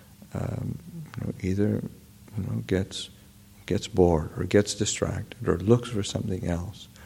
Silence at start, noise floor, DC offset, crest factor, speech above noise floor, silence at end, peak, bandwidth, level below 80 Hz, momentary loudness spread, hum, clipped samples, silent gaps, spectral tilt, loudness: 0.2 s; -52 dBFS; under 0.1%; 22 dB; 25 dB; 0 s; -6 dBFS; 16.5 kHz; -48 dBFS; 16 LU; none; under 0.1%; none; -5.5 dB/octave; -28 LUFS